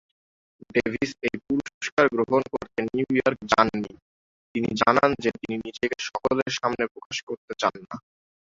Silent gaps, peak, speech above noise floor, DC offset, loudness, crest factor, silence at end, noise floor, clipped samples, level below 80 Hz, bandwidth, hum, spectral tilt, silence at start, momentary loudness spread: 1.74-1.81 s, 1.92-1.97 s, 4.02-4.55 s, 6.91-6.95 s, 7.06-7.10 s, 7.23-7.27 s, 7.37-7.48 s; -4 dBFS; over 65 dB; under 0.1%; -25 LUFS; 22 dB; 0.5 s; under -90 dBFS; under 0.1%; -56 dBFS; 7.8 kHz; none; -4.5 dB/octave; 0.75 s; 12 LU